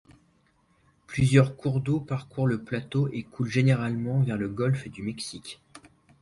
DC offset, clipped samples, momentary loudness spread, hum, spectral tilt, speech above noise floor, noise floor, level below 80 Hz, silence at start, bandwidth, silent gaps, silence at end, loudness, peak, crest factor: under 0.1%; under 0.1%; 14 LU; none; -7 dB/octave; 40 dB; -66 dBFS; -56 dBFS; 1.1 s; 11.5 kHz; none; 0.45 s; -27 LUFS; -6 dBFS; 20 dB